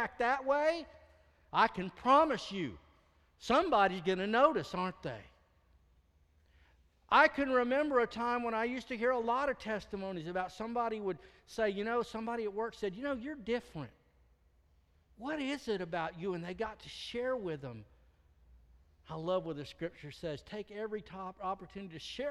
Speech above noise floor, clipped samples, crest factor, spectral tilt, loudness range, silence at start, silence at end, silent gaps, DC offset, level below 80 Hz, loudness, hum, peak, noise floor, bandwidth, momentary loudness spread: 35 dB; under 0.1%; 22 dB; -5.5 dB/octave; 10 LU; 0 s; 0 s; none; under 0.1%; -64 dBFS; -34 LUFS; none; -14 dBFS; -69 dBFS; 12.5 kHz; 16 LU